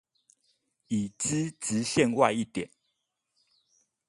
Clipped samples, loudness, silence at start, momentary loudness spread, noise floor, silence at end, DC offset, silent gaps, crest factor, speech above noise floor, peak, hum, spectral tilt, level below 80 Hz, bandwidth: under 0.1%; -28 LUFS; 0.9 s; 11 LU; -80 dBFS; 1.4 s; under 0.1%; none; 24 dB; 52 dB; -8 dBFS; none; -4.5 dB/octave; -66 dBFS; 11.5 kHz